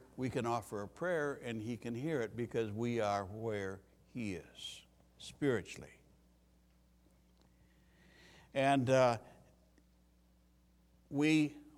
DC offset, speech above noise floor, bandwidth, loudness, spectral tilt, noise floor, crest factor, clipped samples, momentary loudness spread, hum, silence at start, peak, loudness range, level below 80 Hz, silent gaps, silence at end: under 0.1%; 33 dB; 15.5 kHz; -37 LUFS; -6 dB/octave; -69 dBFS; 22 dB; under 0.1%; 18 LU; none; 0 s; -16 dBFS; 8 LU; -68 dBFS; none; 0.1 s